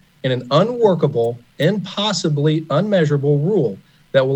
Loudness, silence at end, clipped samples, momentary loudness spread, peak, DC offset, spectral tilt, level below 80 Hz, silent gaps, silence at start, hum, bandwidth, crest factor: -18 LUFS; 0 s; under 0.1%; 7 LU; -2 dBFS; under 0.1%; -6.5 dB/octave; -62 dBFS; none; 0.25 s; none; 8.4 kHz; 16 dB